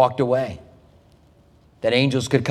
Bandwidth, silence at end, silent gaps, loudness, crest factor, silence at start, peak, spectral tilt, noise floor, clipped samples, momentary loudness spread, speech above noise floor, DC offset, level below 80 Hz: 13 kHz; 0 s; none; -21 LUFS; 20 dB; 0 s; -2 dBFS; -5.5 dB/octave; -54 dBFS; under 0.1%; 11 LU; 34 dB; under 0.1%; -54 dBFS